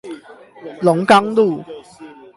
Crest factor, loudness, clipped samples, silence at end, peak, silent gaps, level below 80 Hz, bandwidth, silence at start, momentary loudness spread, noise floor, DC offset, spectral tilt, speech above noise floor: 18 dB; -15 LUFS; under 0.1%; 0.25 s; 0 dBFS; none; -62 dBFS; 11.5 kHz; 0.05 s; 24 LU; -40 dBFS; under 0.1%; -6 dB/octave; 25 dB